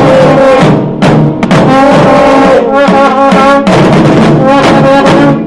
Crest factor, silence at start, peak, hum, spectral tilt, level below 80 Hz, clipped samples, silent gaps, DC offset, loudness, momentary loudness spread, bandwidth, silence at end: 4 dB; 0 s; 0 dBFS; none; -7 dB/octave; -30 dBFS; 7%; none; 0.3%; -4 LUFS; 3 LU; 11.5 kHz; 0 s